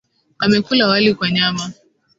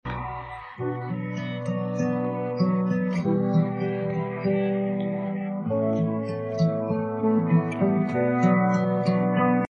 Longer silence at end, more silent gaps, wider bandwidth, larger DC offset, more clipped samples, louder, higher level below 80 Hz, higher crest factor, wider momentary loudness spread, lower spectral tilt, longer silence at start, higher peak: first, 0.45 s vs 0.05 s; neither; first, 8 kHz vs 7 kHz; neither; neither; first, -16 LUFS vs -25 LUFS; about the same, -58 dBFS vs -56 dBFS; about the same, 16 dB vs 16 dB; about the same, 10 LU vs 9 LU; second, -4.5 dB/octave vs -9 dB/octave; first, 0.4 s vs 0.05 s; first, -2 dBFS vs -8 dBFS